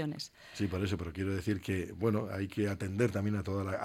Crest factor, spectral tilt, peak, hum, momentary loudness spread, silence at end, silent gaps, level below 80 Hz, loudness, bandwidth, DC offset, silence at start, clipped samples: 16 dB; -6.5 dB/octave; -18 dBFS; none; 6 LU; 0 s; none; -58 dBFS; -35 LUFS; 15.5 kHz; under 0.1%; 0 s; under 0.1%